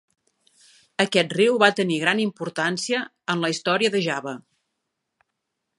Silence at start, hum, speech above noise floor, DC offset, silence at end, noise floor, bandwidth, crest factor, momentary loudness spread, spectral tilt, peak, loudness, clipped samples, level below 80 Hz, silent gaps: 1 s; none; 58 dB; under 0.1%; 1.4 s; -80 dBFS; 11.5 kHz; 24 dB; 10 LU; -4 dB/octave; 0 dBFS; -22 LUFS; under 0.1%; -74 dBFS; none